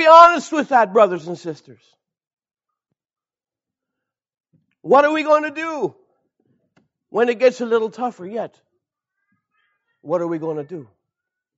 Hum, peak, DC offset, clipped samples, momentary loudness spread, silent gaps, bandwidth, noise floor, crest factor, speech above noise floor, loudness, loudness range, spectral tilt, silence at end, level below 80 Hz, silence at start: none; 0 dBFS; under 0.1%; under 0.1%; 18 LU; 2.27-2.37 s, 4.40-4.44 s; 8 kHz; under -90 dBFS; 20 dB; over 73 dB; -17 LUFS; 10 LU; -2.5 dB/octave; 0.75 s; -68 dBFS; 0 s